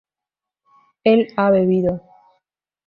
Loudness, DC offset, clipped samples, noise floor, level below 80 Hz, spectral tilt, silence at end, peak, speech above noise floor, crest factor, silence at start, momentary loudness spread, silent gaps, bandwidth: -17 LUFS; under 0.1%; under 0.1%; -87 dBFS; -54 dBFS; -10 dB/octave; 0.9 s; -2 dBFS; 71 dB; 18 dB; 1.05 s; 7 LU; none; 5.6 kHz